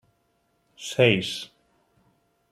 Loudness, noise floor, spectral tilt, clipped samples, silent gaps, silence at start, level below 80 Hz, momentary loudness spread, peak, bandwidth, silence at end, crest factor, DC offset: -23 LUFS; -70 dBFS; -4.5 dB/octave; under 0.1%; none; 0.8 s; -66 dBFS; 19 LU; -4 dBFS; 15 kHz; 1.05 s; 24 dB; under 0.1%